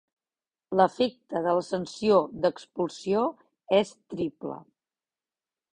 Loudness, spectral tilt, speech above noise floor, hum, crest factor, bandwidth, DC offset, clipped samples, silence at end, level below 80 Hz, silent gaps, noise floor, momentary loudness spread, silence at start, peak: -27 LUFS; -6 dB/octave; over 64 dB; none; 22 dB; 10 kHz; under 0.1%; under 0.1%; 1.15 s; -66 dBFS; none; under -90 dBFS; 10 LU; 0.7 s; -6 dBFS